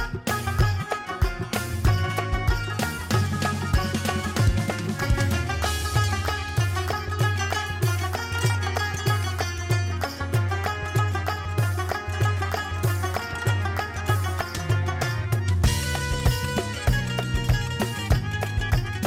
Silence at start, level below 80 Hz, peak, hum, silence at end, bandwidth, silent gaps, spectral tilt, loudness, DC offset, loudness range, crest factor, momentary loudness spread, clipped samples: 0 s; -32 dBFS; -10 dBFS; none; 0 s; 17 kHz; none; -5 dB/octave; -25 LUFS; under 0.1%; 1 LU; 14 dB; 4 LU; under 0.1%